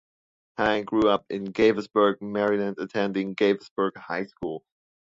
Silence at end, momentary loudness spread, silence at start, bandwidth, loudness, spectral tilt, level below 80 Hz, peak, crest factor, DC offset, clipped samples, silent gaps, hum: 0.55 s; 11 LU; 0.6 s; 7.6 kHz; -25 LUFS; -6.5 dB/octave; -60 dBFS; -8 dBFS; 18 dB; under 0.1%; under 0.1%; 3.71-3.76 s; none